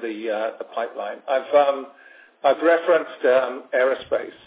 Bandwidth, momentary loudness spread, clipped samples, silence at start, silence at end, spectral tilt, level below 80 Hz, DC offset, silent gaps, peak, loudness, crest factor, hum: 4 kHz; 11 LU; under 0.1%; 0 s; 0.15 s; -7.5 dB/octave; -70 dBFS; under 0.1%; none; -4 dBFS; -22 LUFS; 18 dB; none